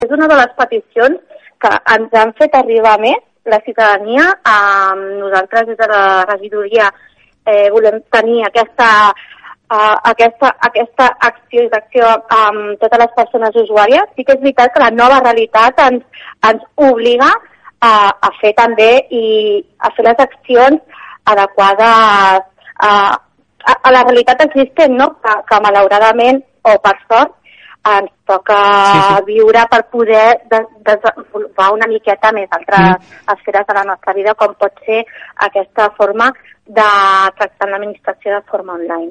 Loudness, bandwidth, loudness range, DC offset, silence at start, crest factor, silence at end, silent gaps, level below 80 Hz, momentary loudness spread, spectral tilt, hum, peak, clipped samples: -10 LUFS; 10 kHz; 3 LU; under 0.1%; 0 s; 10 dB; 0 s; none; -50 dBFS; 9 LU; -4.5 dB/octave; none; 0 dBFS; under 0.1%